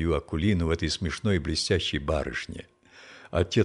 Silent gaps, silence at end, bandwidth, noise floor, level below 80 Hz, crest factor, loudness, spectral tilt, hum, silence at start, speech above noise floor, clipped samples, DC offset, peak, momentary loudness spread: none; 0 s; 11 kHz; -51 dBFS; -40 dBFS; 18 dB; -27 LUFS; -5.5 dB/octave; none; 0 s; 24 dB; under 0.1%; under 0.1%; -10 dBFS; 10 LU